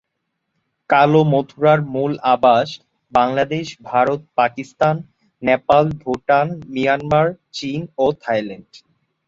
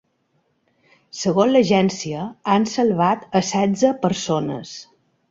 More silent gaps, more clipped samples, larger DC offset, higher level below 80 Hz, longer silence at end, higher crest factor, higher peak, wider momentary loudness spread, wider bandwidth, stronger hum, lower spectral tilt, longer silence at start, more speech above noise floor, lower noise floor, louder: neither; neither; neither; first, -54 dBFS vs -60 dBFS; about the same, 0.5 s vs 0.45 s; about the same, 16 dB vs 16 dB; about the same, -2 dBFS vs -4 dBFS; about the same, 12 LU vs 12 LU; about the same, 7.8 kHz vs 7.8 kHz; neither; first, -7 dB/octave vs -5.5 dB/octave; second, 0.9 s vs 1.15 s; first, 58 dB vs 48 dB; first, -75 dBFS vs -67 dBFS; about the same, -18 LUFS vs -19 LUFS